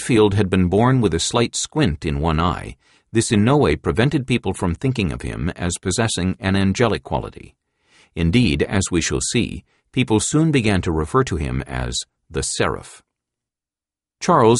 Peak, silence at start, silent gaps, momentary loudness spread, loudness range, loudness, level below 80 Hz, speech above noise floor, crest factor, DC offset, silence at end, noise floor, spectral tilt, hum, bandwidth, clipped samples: -2 dBFS; 0 s; none; 10 LU; 3 LU; -20 LUFS; -36 dBFS; over 71 dB; 18 dB; under 0.1%; 0 s; under -90 dBFS; -5 dB/octave; none; 11.5 kHz; under 0.1%